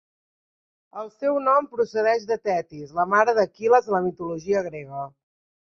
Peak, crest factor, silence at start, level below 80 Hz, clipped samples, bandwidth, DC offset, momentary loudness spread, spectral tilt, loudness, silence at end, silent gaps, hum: -4 dBFS; 20 dB; 0.95 s; -66 dBFS; under 0.1%; 7 kHz; under 0.1%; 16 LU; -6 dB/octave; -23 LUFS; 0.6 s; none; none